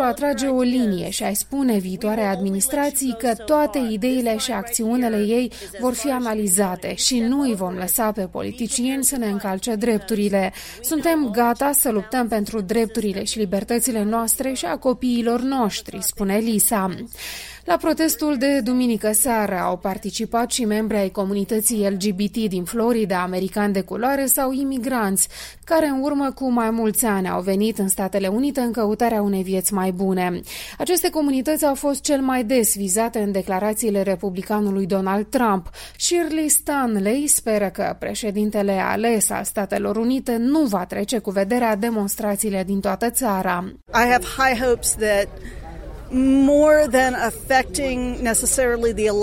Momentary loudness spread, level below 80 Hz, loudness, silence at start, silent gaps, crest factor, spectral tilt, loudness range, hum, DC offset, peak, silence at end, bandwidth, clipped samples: 6 LU; -44 dBFS; -20 LUFS; 0 s; none; 18 dB; -4 dB/octave; 3 LU; none; under 0.1%; -2 dBFS; 0 s; 16.5 kHz; under 0.1%